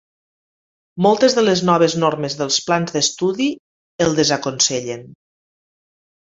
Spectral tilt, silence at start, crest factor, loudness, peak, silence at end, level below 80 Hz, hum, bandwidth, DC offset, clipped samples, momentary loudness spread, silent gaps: -3.5 dB/octave; 0.95 s; 18 dB; -17 LUFS; -2 dBFS; 1.1 s; -58 dBFS; none; 8 kHz; under 0.1%; under 0.1%; 10 LU; 3.59-3.99 s